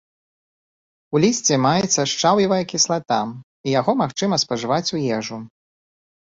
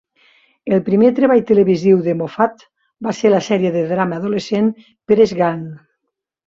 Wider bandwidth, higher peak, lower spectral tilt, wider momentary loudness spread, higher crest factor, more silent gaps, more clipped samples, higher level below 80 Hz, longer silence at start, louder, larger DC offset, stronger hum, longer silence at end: about the same, 7.8 kHz vs 7.8 kHz; about the same, -4 dBFS vs -2 dBFS; second, -4 dB/octave vs -7 dB/octave; second, 8 LU vs 12 LU; about the same, 18 dB vs 14 dB; first, 3.43-3.64 s vs none; neither; about the same, -60 dBFS vs -58 dBFS; first, 1.1 s vs 0.65 s; second, -19 LUFS vs -16 LUFS; neither; neither; about the same, 0.8 s vs 0.7 s